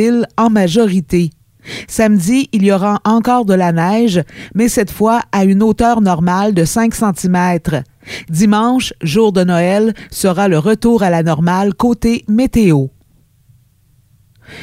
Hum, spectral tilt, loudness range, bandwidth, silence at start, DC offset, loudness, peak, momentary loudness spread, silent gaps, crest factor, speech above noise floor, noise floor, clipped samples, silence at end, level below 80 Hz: none; -6 dB/octave; 1 LU; 16 kHz; 0 s; under 0.1%; -13 LUFS; 0 dBFS; 6 LU; none; 12 dB; 40 dB; -52 dBFS; under 0.1%; 0 s; -38 dBFS